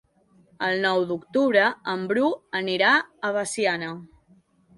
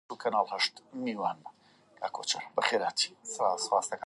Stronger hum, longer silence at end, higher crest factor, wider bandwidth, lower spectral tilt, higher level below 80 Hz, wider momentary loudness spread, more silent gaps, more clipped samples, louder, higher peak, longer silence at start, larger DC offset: neither; first, 0.7 s vs 0 s; about the same, 20 dB vs 22 dB; about the same, 11.5 kHz vs 11.5 kHz; first, -4 dB/octave vs -1.5 dB/octave; first, -68 dBFS vs -86 dBFS; about the same, 10 LU vs 9 LU; neither; neither; first, -23 LUFS vs -31 LUFS; first, -6 dBFS vs -10 dBFS; first, 0.6 s vs 0.1 s; neither